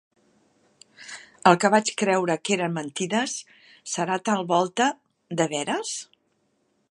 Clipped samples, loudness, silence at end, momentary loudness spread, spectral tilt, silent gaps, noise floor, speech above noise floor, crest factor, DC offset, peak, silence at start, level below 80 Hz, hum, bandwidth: under 0.1%; -24 LUFS; 0.85 s; 20 LU; -4 dB/octave; none; -70 dBFS; 46 dB; 24 dB; under 0.1%; -2 dBFS; 1 s; -74 dBFS; none; 11.5 kHz